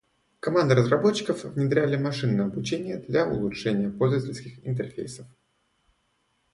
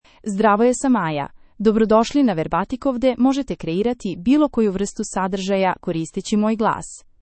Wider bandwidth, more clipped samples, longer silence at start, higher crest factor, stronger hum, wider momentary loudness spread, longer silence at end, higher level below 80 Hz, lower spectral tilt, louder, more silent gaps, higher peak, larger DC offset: first, 11.5 kHz vs 8.8 kHz; neither; first, 0.45 s vs 0.25 s; about the same, 20 dB vs 16 dB; neither; first, 13 LU vs 9 LU; first, 1.3 s vs 0.2 s; second, -58 dBFS vs -46 dBFS; about the same, -6.5 dB/octave vs -5.5 dB/octave; second, -26 LUFS vs -20 LUFS; neither; second, -6 dBFS vs -2 dBFS; neither